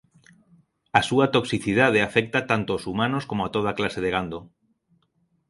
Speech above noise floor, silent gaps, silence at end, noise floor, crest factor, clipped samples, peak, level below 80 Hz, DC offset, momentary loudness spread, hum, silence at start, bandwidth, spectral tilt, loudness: 46 dB; none; 1.05 s; -69 dBFS; 24 dB; under 0.1%; 0 dBFS; -54 dBFS; under 0.1%; 8 LU; none; 0.95 s; 11.5 kHz; -5.5 dB/octave; -23 LUFS